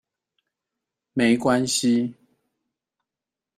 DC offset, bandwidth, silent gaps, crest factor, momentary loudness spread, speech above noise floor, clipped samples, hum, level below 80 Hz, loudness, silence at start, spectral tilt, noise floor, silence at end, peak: under 0.1%; 14 kHz; none; 18 dB; 10 LU; 68 dB; under 0.1%; none; -64 dBFS; -22 LUFS; 1.15 s; -4 dB/octave; -88 dBFS; 1.45 s; -8 dBFS